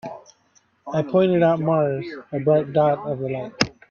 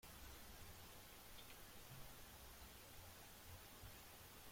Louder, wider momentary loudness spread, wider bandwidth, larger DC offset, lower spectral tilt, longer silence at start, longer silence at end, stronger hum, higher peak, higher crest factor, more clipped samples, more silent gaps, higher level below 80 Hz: first, -21 LUFS vs -59 LUFS; first, 12 LU vs 1 LU; second, 7.4 kHz vs 16.5 kHz; neither; first, -6.5 dB/octave vs -3 dB/octave; about the same, 0.05 s vs 0 s; first, 0.2 s vs 0 s; neither; first, -2 dBFS vs -44 dBFS; first, 20 dB vs 14 dB; neither; neither; first, -58 dBFS vs -68 dBFS